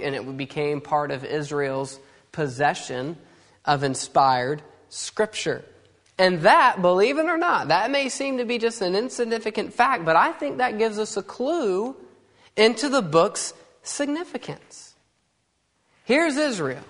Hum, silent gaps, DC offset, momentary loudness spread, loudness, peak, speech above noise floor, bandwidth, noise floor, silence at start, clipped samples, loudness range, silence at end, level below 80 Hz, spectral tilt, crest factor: none; none; under 0.1%; 14 LU; -23 LUFS; -2 dBFS; 48 dB; 11 kHz; -70 dBFS; 0 s; under 0.1%; 7 LU; 0.05 s; -66 dBFS; -4 dB/octave; 22 dB